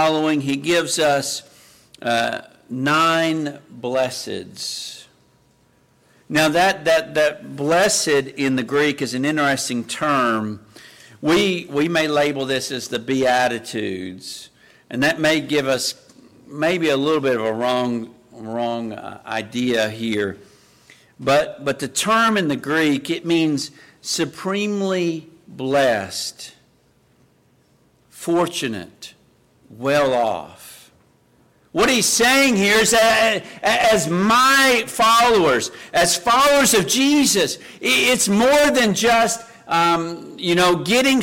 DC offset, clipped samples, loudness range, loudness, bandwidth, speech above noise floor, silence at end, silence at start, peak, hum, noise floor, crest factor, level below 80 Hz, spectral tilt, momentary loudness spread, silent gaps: under 0.1%; under 0.1%; 9 LU; -18 LUFS; 17 kHz; 40 dB; 0 s; 0 s; -6 dBFS; none; -58 dBFS; 14 dB; -54 dBFS; -3 dB/octave; 15 LU; none